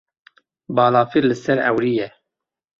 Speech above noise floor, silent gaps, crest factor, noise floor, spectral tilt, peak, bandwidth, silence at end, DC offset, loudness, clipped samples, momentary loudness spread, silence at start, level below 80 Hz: 66 dB; none; 18 dB; -83 dBFS; -7 dB/octave; -2 dBFS; 7.6 kHz; 0.7 s; under 0.1%; -18 LUFS; under 0.1%; 9 LU; 0.7 s; -60 dBFS